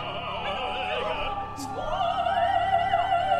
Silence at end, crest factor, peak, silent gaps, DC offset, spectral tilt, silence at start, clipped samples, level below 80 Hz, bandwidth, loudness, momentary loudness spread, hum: 0 s; 14 dB; -12 dBFS; none; under 0.1%; -4 dB/octave; 0 s; under 0.1%; -44 dBFS; 13.5 kHz; -27 LUFS; 8 LU; none